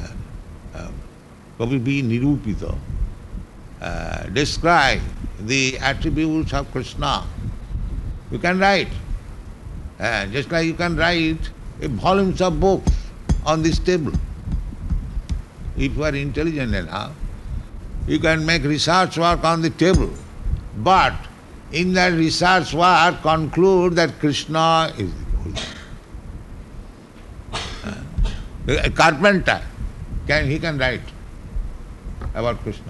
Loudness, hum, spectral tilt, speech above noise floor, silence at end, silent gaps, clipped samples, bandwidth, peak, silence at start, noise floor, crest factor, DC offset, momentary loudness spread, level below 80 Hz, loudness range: -20 LUFS; none; -5 dB/octave; 24 dB; 0 s; none; under 0.1%; 12 kHz; -2 dBFS; 0 s; -43 dBFS; 20 dB; under 0.1%; 20 LU; -30 dBFS; 8 LU